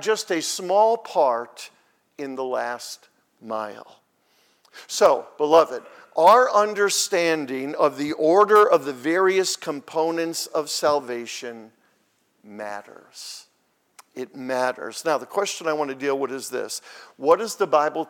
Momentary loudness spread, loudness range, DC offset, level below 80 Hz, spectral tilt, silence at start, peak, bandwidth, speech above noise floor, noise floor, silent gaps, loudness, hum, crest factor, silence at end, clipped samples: 20 LU; 13 LU; under 0.1%; -74 dBFS; -2.5 dB/octave; 0 s; -4 dBFS; 18.5 kHz; 45 dB; -67 dBFS; none; -22 LUFS; none; 20 dB; 0.05 s; under 0.1%